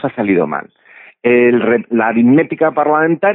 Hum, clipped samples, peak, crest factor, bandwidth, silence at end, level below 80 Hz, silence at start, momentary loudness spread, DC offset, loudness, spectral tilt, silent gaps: none; under 0.1%; 0 dBFS; 12 dB; 3.9 kHz; 0 s; -60 dBFS; 0.05 s; 6 LU; under 0.1%; -13 LUFS; -12.5 dB/octave; none